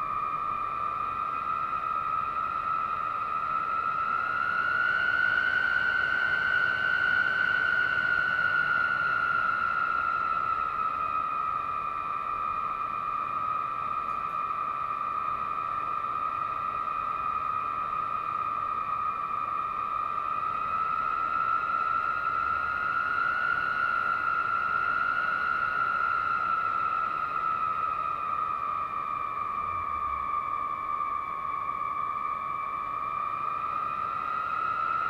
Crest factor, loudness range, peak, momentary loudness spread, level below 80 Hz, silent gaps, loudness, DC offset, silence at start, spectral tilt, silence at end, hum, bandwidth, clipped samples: 14 dB; 6 LU; -14 dBFS; 6 LU; -58 dBFS; none; -28 LUFS; under 0.1%; 0 s; -4 dB/octave; 0 s; none; 11 kHz; under 0.1%